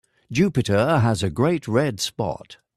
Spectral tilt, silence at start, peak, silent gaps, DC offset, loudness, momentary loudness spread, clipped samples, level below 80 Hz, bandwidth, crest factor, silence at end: -6 dB/octave; 0.3 s; -8 dBFS; none; under 0.1%; -22 LUFS; 9 LU; under 0.1%; -52 dBFS; 14 kHz; 14 dB; 0.2 s